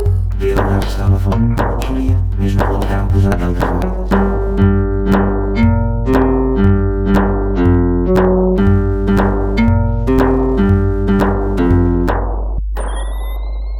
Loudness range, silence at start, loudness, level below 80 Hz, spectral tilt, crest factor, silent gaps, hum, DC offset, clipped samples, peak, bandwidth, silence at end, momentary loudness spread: 2 LU; 0 s; -15 LUFS; -18 dBFS; -8.5 dB/octave; 12 dB; none; none; under 0.1%; under 0.1%; -2 dBFS; 13 kHz; 0 s; 6 LU